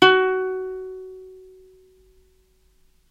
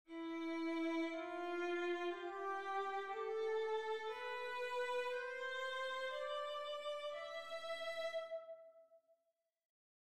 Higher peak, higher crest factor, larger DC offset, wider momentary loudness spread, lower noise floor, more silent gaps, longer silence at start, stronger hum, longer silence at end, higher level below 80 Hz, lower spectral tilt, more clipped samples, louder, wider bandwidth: first, 0 dBFS vs -30 dBFS; first, 24 dB vs 12 dB; neither; first, 26 LU vs 6 LU; second, -60 dBFS vs -87 dBFS; neither; about the same, 0 s vs 0.05 s; neither; first, 1.75 s vs 0.35 s; first, -58 dBFS vs -86 dBFS; first, -4 dB/octave vs -2.5 dB/octave; neither; first, -22 LUFS vs -43 LUFS; second, 8 kHz vs 14 kHz